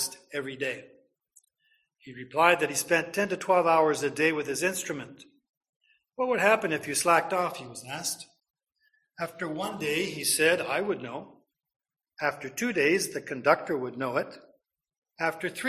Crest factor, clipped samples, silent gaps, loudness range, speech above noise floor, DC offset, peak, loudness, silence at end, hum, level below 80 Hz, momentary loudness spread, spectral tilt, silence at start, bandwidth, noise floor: 22 dB; under 0.1%; 5.49-5.61 s, 5.69-5.81 s, 11.76-11.80 s, 14.98-15.02 s; 4 LU; 44 dB; under 0.1%; -8 dBFS; -27 LUFS; 0 s; none; -72 dBFS; 15 LU; -3 dB/octave; 0 s; 15 kHz; -72 dBFS